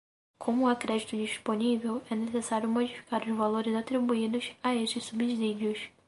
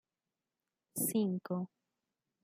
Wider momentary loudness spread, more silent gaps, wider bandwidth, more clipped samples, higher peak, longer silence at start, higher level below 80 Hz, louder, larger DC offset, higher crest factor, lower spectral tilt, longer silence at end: second, 5 LU vs 12 LU; neither; second, 11.5 kHz vs 16.5 kHz; neither; first, -14 dBFS vs -22 dBFS; second, 0.4 s vs 0.95 s; first, -72 dBFS vs -84 dBFS; first, -31 LUFS vs -36 LUFS; neither; about the same, 16 dB vs 18 dB; about the same, -4.5 dB/octave vs -5.5 dB/octave; second, 0.2 s vs 0.75 s